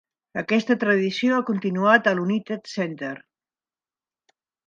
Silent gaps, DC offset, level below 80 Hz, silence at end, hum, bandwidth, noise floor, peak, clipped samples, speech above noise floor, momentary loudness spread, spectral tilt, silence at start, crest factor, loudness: none; under 0.1%; -72 dBFS; 1.5 s; none; 7.6 kHz; under -90 dBFS; -2 dBFS; under 0.1%; over 68 dB; 15 LU; -6 dB/octave; 0.35 s; 22 dB; -22 LUFS